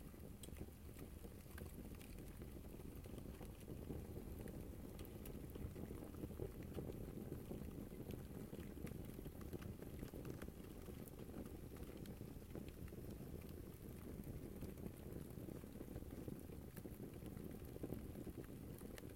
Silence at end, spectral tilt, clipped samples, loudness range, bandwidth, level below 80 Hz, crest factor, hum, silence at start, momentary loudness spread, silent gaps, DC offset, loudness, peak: 0 s; -6.5 dB/octave; under 0.1%; 2 LU; 16.5 kHz; -60 dBFS; 20 dB; none; 0 s; 4 LU; none; under 0.1%; -54 LUFS; -32 dBFS